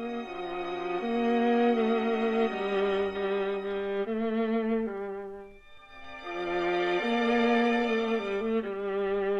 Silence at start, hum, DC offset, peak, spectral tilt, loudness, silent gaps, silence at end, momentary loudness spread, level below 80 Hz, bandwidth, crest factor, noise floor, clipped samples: 0 s; none; under 0.1%; -14 dBFS; -6 dB/octave; -29 LUFS; none; 0 s; 11 LU; -58 dBFS; 7.6 kHz; 14 dB; -50 dBFS; under 0.1%